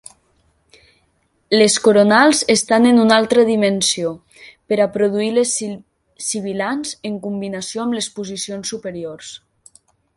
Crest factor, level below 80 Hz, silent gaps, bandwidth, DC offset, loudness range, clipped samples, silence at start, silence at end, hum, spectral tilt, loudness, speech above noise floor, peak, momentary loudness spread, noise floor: 18 dB; -60 dBFS; none; 11.5 kHz; under 0.1%; 11 LU; under 0.1%; 1.5 s; 0.8 s; none; -3.5 dB/octave; -16 LUFS; 47 dB; 0 dBFS; 16 LU; -63 dBFS